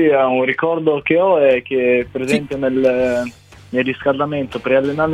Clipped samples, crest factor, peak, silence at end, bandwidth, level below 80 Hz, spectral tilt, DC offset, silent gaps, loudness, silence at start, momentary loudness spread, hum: under 0.1%; 14 dB; -2 dBFS; 0 s; 11.5 kHz; -50 dBFS; -6.5 dB/octave; 0.1%; none; -17 LUFS; 0 s; 7 LU; none